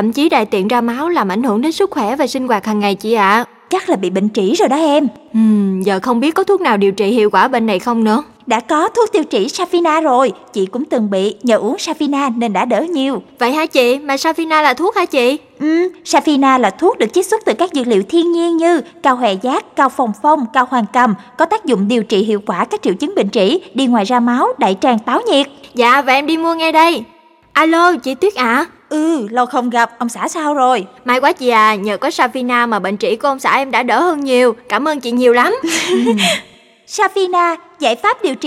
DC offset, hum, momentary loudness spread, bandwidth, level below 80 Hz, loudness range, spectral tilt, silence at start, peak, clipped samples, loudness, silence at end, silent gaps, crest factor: under 0.1%; none; 5 LU; 15.5 kHz; -62 dBFS; 2 LU; -4.5 dB/octave; 0 s; 0 dBFS; under 0.1%; -14 LUFS; 0 s; none; 14 dB